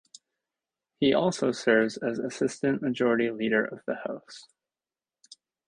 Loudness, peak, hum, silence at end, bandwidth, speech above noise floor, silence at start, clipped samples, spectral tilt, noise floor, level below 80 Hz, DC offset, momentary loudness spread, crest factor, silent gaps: -27 LUFS; -8 dBFS; none; 1.25 s; 10.5 kHz; over 63 dB; 1 s; under 0.1%; -5 dB/octave; under -90 dBFS; -68 dBFS; under 0.1%; 12 LU; 20 dB; none